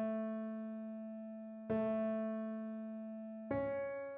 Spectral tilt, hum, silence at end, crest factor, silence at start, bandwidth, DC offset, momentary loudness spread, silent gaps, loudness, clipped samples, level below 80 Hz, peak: -7.5 dB/octave; none; 0 s; 14 dB; 0 s; 3.8 kHz; under 0.1%; 10 LU; none; -42 LUFS; under 0.1%; -72 dBFS; -26 dBFS